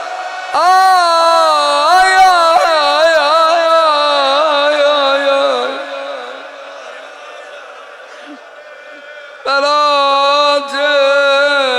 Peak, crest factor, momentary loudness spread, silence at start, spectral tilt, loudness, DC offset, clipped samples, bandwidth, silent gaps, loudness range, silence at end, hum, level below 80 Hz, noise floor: 0 dBFS; 12 dB; 22 LU; 0 s; 0.5 dB/octave; -10 LUFS; under 0.1%; under 0.1%; 16 kHz; none; 17 LU; 0 s; none; -54 dBFS; -34 dBFS